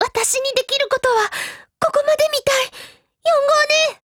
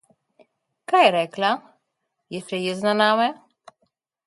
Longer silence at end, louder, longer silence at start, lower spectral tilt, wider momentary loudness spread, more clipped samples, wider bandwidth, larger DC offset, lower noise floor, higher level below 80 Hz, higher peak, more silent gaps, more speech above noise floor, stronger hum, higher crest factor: second, 0.1 s vs 0.95 s; first, -17 LUFS vs -21 LUFS; second, 0 s vs 0.9 s; second, 0 dB/octave vs -4.5 dB/octave; second, 10 LU vs 17 LU; neither; first, 20 kHz vs 11.5 kHz; neither; second, -41 dBFS vs -78 dBFS; first, -56 dBFS vs -74 dBFS; about the same, -4 dBFS vs -4 dBFS; neither; second, 22 dB vs 57 dB; neither; second, 14 dB vs 20 dB